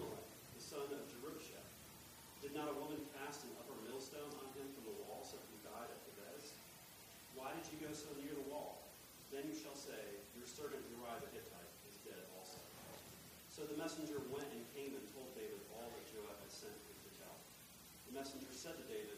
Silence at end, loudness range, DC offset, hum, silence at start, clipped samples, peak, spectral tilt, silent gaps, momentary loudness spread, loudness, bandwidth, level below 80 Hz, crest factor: 0 s; 3 LU; under 0.1%; none; 0 s; under 0.1%; -34 dBFS; -3.5 dB/octave; none; 10 LU; -52 LUFS; 15.5 kHz; -76 dBFS; 18 dB